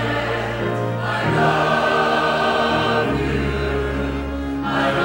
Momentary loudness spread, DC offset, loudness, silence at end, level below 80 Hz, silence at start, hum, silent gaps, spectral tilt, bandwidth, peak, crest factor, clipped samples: 6 LU; under 0.1%; -20 LUFS; 0 s; -34 dBFS; 0 s; none; none; -6 dB/octave; 16 kHz; -4 dBFS; 14 dB; under 0.1%